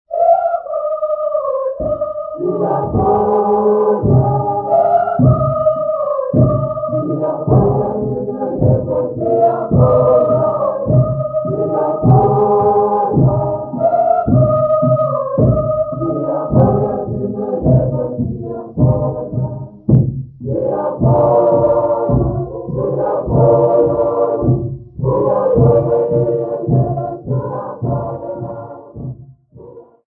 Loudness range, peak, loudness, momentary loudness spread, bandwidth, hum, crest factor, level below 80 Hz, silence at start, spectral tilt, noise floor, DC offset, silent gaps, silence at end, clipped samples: 3 LU; 0 dBFS; -15 LUFS; 10 LU; 2 kHz; none; 14 dB; -34 dBFS; 0.1 s; -15 dB/octave; -39 dBFS; under 0.1%; none; 0.25 s; under 0.1%